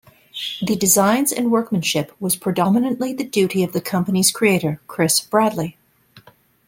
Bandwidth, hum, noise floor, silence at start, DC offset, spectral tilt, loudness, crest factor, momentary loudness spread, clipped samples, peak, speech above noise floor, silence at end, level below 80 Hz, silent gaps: 17 kHz; none; -50 dBFS; 0.35 s; under 0.1%; -4 dB/octave; -18 LUFS; 18 dB; 10 LU; under 0.1%; -2 dBFS; 32 dB; 0.5 s; -58 dBFS; none